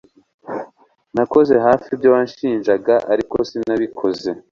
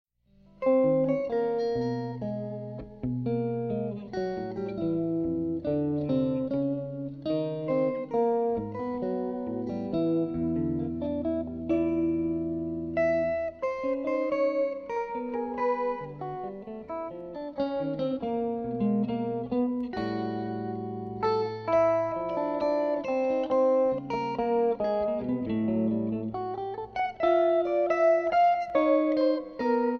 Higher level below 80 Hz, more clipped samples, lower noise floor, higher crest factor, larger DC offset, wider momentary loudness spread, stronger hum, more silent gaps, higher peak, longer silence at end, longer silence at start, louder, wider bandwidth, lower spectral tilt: about the same, -54 dBFS vs -56 dBFS; neither; second, -50 dBFS vs -60 dBFS; about the same, 16 dB vs 16 dB; neither; first, 13 LU vs 10 LU; neither; neither; first, 0 dBFS vs -12 dBFS; first, 0.15 s vs 0 s; second, 0.45 s vs 0.6 s; first, -17 LUFS vs -29 LUFS; first, 7.2 kHz vs 6.4 kHz; second, -7 dB/octave vs -9 dB/octave